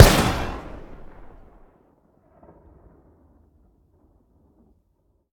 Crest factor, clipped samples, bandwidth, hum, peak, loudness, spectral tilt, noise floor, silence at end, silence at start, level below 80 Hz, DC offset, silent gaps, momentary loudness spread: 24 dB; 0.1%; 19.5 kHz; none; 0 dBFS; -21 LUFS; -4.5 dB/octave; -67 dBFS; 4.4 s; 0 s; -32 dBFS; under 0.1%; none; 30 LU